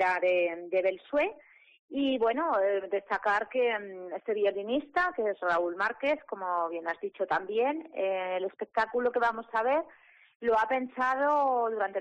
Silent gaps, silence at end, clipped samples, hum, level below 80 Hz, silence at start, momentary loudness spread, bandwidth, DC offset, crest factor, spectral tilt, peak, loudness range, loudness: 1.79-1.88 s, 10.35-10.40 s; 0 s; under 0.1%; none; -68 dBFS; 0 s; 7 LU; 8.6 kHz; under 0.1%; 12 dB; -5 dB/octave; -18 dBFS; 2 LU; -30 LUFS